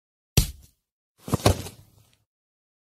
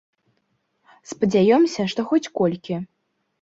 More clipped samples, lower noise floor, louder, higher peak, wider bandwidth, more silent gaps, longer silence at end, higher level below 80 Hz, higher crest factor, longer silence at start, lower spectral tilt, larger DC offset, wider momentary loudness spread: neither; second, -58 dBFS vs -70 dBFS; second, -26 LUFS vs -21 LUFS; first, -2 dBFS vs -6 dBFS; first, 16 kHz vs 8 kHz; first, 0.92-1.15 s vs none; first, 1.2 s vs 0.55 s; first, -38 dBFS vs -62 dBFS; first, 26 dB vs 16 dB; second, 0.35 s vs 1.1 s; second, -4.5 dB/octave vs -6 dB/octave; neither; first, 17 LU vs 14 LU